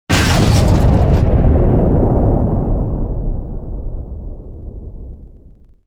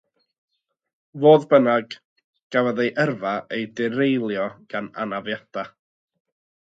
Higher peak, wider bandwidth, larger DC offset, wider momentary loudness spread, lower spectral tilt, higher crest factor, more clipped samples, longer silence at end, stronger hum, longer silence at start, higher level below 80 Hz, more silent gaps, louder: about the same, 0 dBFS vs -2 dBFS; first, 16.5 kHz vs 7.8 kHz; neither; first, 21 LU vs 16 LU; about the same, -6.5 dB/octave vs -7 dB/octave; second, 14 dB vs 20 dB; neither; second, 0.6 s vs 0.95 s; neither; second, 0.1 s vs 1.15 s; first, -18 dBFS vs -72 dBFS; second, none vs 2.05-2.16 s, 2.24-2.33 s, 2.43-2.50 s; first, -14 LUFS vs -21 LUFS